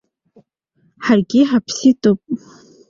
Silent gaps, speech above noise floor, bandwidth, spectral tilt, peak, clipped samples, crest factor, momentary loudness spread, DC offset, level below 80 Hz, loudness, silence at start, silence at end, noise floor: none; 47 dB; 7.4 kHz; -5.5 dB/octave; -2 dBFS; under 0.1%; 16 dB; 12 LU; under 0.1%; -58 dBFS; -16 LUFS; 1 s; 0.5 s; -61 dBFS